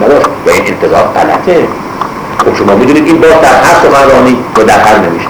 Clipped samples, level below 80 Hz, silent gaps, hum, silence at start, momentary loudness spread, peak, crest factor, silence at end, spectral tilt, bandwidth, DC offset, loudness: 5%; -32 dBFS; none; none; 0 s; 8 LU; 0 dBFS; 6 dB; 0 s; -5 dB/octave; over 20 kHz; under 0.1%; -6 LUFS